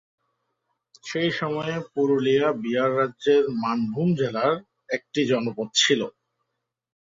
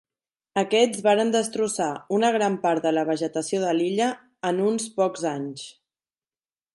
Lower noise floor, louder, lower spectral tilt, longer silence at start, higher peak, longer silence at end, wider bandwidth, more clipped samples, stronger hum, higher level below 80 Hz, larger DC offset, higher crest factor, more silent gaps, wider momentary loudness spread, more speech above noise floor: second, -81 dBFS vs under -90 dBFS; about the same, -24 LUFS vs -24 LUFS; about the same, -4.5 dB/octave vs -4 dB/octave; first, 1.05 s vs 0.55 s; about the same, -6 dBFS vs -8 dBFS; about the same, 1.1 s vs 1.05 s; second, 7.8 kHz vs 11.5 kHz; neither; neither; first, -68 dBFS vs -74 dBFS; neither; about the same, 18 dB vs 18 dB; neither; about the same, 10 LU vs 9 LU; second, 58 dB vs over 67 dB